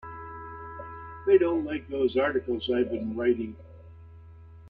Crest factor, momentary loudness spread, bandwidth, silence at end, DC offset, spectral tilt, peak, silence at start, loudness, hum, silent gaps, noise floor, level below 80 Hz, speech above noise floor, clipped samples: 20 dB; 18 LU; 4.8 kHz; 0 s; under 0.1%; -9 dB/octave; -10 dBFS; 0 s; -27 LUFS; none; none; -48 dBFS; -56 dBFS; 23 dB; under 0.1%